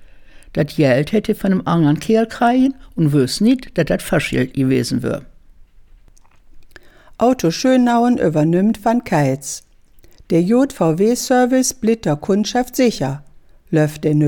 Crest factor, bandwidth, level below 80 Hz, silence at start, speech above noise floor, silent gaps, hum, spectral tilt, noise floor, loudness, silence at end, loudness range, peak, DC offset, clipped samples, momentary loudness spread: 14 dB; 18 kHz; -44 dBFS; 0 s; 31 dB; none; none; -6 dB/octave; -46 dBFS; -17 LUFS; 0 s; 5 LU; -2 dBFS; under 0.1%; under 0.1%; 7 LU